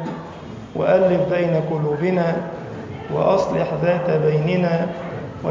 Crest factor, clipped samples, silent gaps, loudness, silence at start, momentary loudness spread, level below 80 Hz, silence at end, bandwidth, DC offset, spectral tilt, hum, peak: 16 dB; under 0.1%; none; -20 LUFS; 0 s; 14 LU; -50 dBFS; 0 s; 7.6 kHz; under 0.1%; -8 dB/octave; none; -4 dBFS